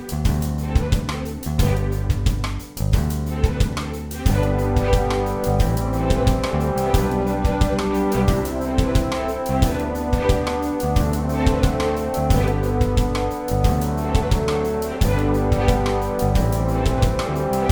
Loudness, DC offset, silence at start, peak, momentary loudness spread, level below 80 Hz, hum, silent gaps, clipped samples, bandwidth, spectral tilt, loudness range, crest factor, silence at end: -21 LUFS; under 0.1%; 0 s; -4 dBFS; 4 LU; -24 dBFS; none; none; under 0.1%; over 20 kHz; -6.5 dB/octave; 2 LU; 16 dB; 0 s